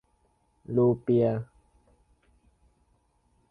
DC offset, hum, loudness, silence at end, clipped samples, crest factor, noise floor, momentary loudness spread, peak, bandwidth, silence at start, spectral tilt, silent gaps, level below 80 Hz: under 0.1%; none; -26 LUFS; 2.05 s; under 0.1%; 18 dB; -69 dBFS; 12 LU; -14 dBFS; 4.6 kHz; 0.7 s; -11.5 dB/octave; none; -62 dBFS